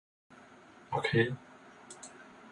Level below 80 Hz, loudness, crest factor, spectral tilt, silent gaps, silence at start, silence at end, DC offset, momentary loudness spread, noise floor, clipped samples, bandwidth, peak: -68 dBFS; -32 LUFS; 22 dB; -5.5 dB/octave; none; 0.3 s; 0.05 s; under 0.1%; 26 LU; -56 dBFS; under 0.1%; 11 kHz; -14 dBFS